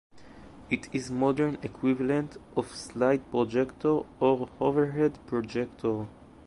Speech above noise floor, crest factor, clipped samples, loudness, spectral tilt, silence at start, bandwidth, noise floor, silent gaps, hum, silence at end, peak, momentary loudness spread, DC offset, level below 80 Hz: 21 dB; 16 dB; under 0.1%; -29 LUFS; -7 dB/octave; 0.15 s; 11.5 kHz; -49 dBFS; none; none; 0.05 s; -12 dBFS; 7 LU; under 0.1%; -58 dBFS